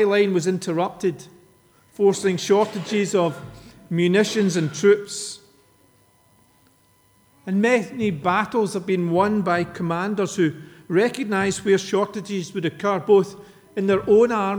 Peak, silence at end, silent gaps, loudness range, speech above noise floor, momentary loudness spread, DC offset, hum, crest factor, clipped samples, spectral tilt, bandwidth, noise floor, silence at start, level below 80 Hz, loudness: -6 dBFS; 0 s; none; 4 LU; 38 dB; 10 LU; under 0.1%; none; 16 dB; under 0.1%; -5.5 dB/octave; over 20 kHz; -59 dBFS; 0 s; -60 dBFS; -21 LUFS